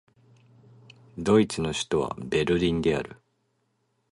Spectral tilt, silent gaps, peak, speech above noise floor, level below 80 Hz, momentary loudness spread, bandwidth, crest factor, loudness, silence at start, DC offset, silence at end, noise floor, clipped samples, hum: -5.5 dB/octave; none; -8 dBFS; 48 dB; -50 dBFS; 10 LU; 11.5 kHz; 20 dB; -25 LUFS; 1.15 s; under 0.1%; 1 s; -73 dBFS; under 0.1%; none